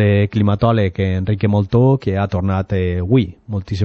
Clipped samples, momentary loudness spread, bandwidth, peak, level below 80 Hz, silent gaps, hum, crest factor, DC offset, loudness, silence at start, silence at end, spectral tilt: under 0.1%; 5 LU; 6.6 kHz; -2 dBFS; -40 dBFS; none; none; 14 dB; under 0.1%; -17 LUFS; 0 s; 0 s; -9.5 dB/octave